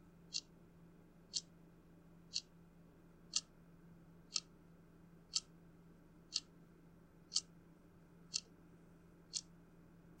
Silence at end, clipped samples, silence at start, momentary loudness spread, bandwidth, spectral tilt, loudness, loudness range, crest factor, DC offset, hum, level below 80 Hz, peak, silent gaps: 0 s; under 0.1%; 0 s; 23 LU; 16 kHz; -0.5 dB/octave; -44 LUFS; 1 LU; 34 dB; under 0.1%; none; -72 dBFS; -18 dBFS; none